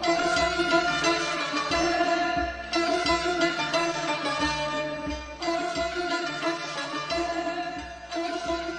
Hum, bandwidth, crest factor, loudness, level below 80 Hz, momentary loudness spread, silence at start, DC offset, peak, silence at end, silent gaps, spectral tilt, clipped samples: none; 10 kHz; 18 dB; -27 LUFS; -48 dBFS; 8 LU; 0 s; under 0.1%; -10 dBFS; 0 s; none; -3 dB/octave; under 0.1%